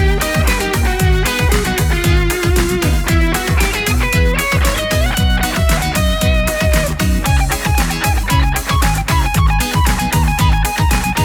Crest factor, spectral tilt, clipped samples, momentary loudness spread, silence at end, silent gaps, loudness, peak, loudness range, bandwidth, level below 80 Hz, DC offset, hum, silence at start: 12 dB; -4.5 dB/octave; under 0.1%; 2 LU; 0 s; none; -15 LUFS; -2 dBFS; 0 LU; over 20 kHz; -16 dBFS; under 0.1%; none; 0 s